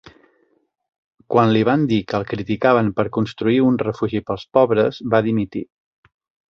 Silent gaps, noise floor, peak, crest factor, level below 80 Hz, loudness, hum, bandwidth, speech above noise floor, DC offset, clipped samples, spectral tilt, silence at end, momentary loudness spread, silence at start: none; -64 dBFS; -2 dBFS; 18 dB; -52 dBFS; -19 LUFS; none; 6.8 kHz; 46 dB; under 0.1%; under 0.1%; -8 dB/octave; 0.85 s; 8 LU; 1.3 s